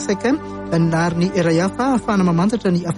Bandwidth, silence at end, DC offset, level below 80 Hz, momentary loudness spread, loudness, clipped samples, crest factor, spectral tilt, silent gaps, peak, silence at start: 11 kHz; 0 s; under 0.1%; -44 dBFS; 3 LU; -18 LUFS; under 0.1%; 12 dB; -6.5 dB/octave; none; -6 dBFS; 0 s